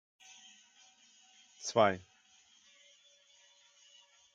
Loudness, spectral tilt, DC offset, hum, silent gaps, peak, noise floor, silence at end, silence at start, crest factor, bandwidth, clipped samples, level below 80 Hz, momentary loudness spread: -32 LUFS; -4 dB/octave; under 0.1%; none; none; -12 dBFS; -66 dBFS; 2.35 s; 1.6 s; 28 dB; 9.2 kHz; under 0.1%; -88 dBFS; 28 LU